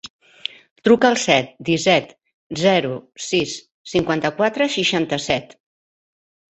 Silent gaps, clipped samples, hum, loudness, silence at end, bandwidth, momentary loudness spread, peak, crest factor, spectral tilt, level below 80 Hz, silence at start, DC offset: 0.10-0.19 s, 0.71-0.76 s, 2.34-2.50 s, 3.71-3.85 s; under 0.1%; none; -19 LUFS; 1.1 s; 8.4 kHz; 16 LU; -2 dBFS; 20 dB; -4 dB/octave; -56 dBFS; 0.05 s; under 0.1%